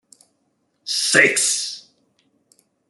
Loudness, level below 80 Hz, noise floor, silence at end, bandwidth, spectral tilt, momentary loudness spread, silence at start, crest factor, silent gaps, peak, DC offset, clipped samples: -17 LUFS; -74 dBFS; -69 dBFS; 1.1 s; 12.5 kHz; -0.5 dB/octave; 21 LU; 0.85 s; 22 dB; none; -2 dBFS; under 0.1%; under 0.1%